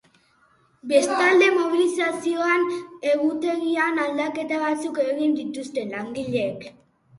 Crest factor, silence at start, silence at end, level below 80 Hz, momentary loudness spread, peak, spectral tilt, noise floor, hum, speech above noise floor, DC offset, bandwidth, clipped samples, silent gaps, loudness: 18 dB; 0.85 s; 0.5 s; -68 dBFS; 12 LU; -6 dBFS; -4 dB/octave; -61 dBFS; none; 39 dB; under 0.1%; 11.5 kHz; under 0.1%; none; -22 LUFS